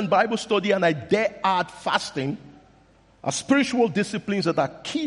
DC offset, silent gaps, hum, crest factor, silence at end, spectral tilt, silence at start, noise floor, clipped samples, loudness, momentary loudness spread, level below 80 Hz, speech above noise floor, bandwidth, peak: under 0.1%; none; none; 18 dB; 0 s; -4.5 dB/octave; 0 s; -56 dBFS; under 0.1%; -23 LUFS; 8 LU; -62 dBFS; 33 dB; 11.5 kHz; -6 dBFS